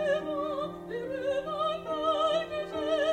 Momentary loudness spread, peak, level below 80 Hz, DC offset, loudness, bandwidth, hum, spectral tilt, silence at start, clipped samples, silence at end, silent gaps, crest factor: 8 LU; -16 dBFS; -62 dBFS; under 0.1%; -31 LUFS; 10 kHz; none; -5 dB/octave; 0 s; under 0.1%; 0 s; none; 14 dB